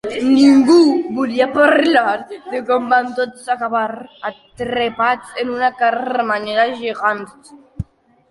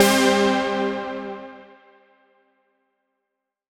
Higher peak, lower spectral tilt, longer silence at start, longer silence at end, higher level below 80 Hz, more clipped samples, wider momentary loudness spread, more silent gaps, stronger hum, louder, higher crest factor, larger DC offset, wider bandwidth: about the same, -2 dBFS vs -2 dBFS; first, -5 dB/octave vs -3.5 dB/octave; about the same, 0.05 s vs 0 s; second, 0.5 s vs 2.05 s; first, -48 dBFS vs -58 dBFS; neither; second, 17 LU vs 20 LU; neither; neither; first, -16 LUFS vs -21 LUFS; second, 16 dB vs 22 dB; neither; second, 11.5 kHz vs 19.5 kHz